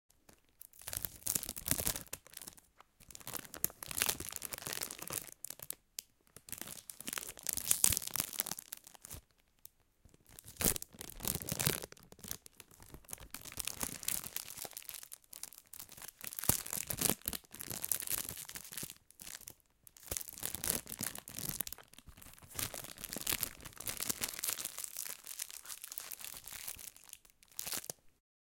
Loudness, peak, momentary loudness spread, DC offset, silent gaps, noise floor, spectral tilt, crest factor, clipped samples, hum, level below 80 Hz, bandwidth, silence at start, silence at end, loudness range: -38 LUFS; -4 dBFS; 18 LU; under 0.1%; none; -67 dBFS; -1.5 dB/octave; 38 dB; under 0.1%; none; -60 dBFS; 17 kHz; 0.3 s; 0.3 s; 6 LU